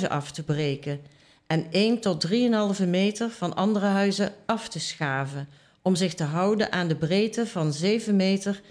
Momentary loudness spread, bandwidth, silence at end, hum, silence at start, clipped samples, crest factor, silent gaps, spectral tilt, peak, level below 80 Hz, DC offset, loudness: 8 LU; 11 kHz; 0.1 s; none; 0 s; under 0.1%; 16 dB; none; -5.5 dB/octave; -10 dBFS; -64 dBFS; under 0.1%; -25 LUFS